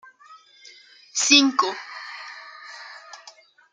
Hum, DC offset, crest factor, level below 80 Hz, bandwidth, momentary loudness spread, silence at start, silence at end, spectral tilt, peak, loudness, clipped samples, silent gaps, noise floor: none; under 0.1%; 24 dB; -80 dBFS; 9.6 kHz; 26 LU; 1.15 s; 0.55 s; 1 dB/octave; -2 dBFS; -18 LUFS; under 0.1%; none; -51 dBFS